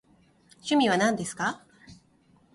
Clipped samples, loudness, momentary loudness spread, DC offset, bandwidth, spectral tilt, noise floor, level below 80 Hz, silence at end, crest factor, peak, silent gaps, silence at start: under 0.1%; -26 LUFS; 15 LU; under 0.1%; 11.5 kHz; -4 dB/octave; -62 dBFS; -66 dBFS; 0.6 s; 18 dB; -10 dBFS; none; 0.65 s